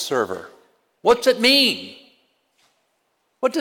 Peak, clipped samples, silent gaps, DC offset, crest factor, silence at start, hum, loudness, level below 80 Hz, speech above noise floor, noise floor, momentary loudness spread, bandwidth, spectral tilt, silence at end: -6 dBFS; under 0.1%; none; under 0.1%; 16 dB; 0 s; none; -18 LUFS; -60 dBFS; 51 dB; -70 dBFS; 17 LU; 19 kHz; -2.5 dB/octave; 0 s